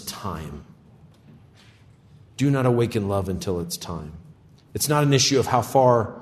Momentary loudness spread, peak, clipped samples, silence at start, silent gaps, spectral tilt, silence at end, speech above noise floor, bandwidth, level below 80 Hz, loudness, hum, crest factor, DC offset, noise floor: 19 LU; -4 dBFS; under 0.1%; 0 s; none; -5 dB/octave; 0 s; 30 dB; 14 kHz; -52 dBFS; -22 LUFS; none; 20 dB; under 0.1%; -52 dBFS